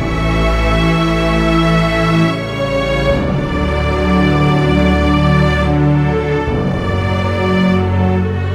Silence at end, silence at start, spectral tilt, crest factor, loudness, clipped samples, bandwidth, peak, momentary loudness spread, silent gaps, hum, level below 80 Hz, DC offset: 0 s; 0 s; -7 dB/octave; 12 dB; -14 LUFS; under 0.1%; 12.5 kHz; 0 dBFS; 4 LU; none; none; -22 dBFS; under 0.1%